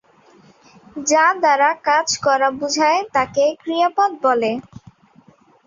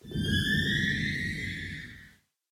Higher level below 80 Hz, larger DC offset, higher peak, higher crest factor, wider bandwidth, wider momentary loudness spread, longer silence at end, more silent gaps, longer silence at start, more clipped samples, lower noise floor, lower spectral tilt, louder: second, -62 dBFS vs -46 dBFS; neither; first, -2 dBFS vs -16 dBFS; about the same, 16 dB vs 16 dB; second, 7.8 kHz vs 16.5 kHz; second, 5 LU vs 14 LU; first, 1.05 s vs 0.45 s; neither; first, 0.95 s vs 0.05 s; neither; second, -52 dBFS vs -58 dBFS; second, -2 dB/octave vs -4.5 dB/octave; first, -17 LUFS vs -29 LUFS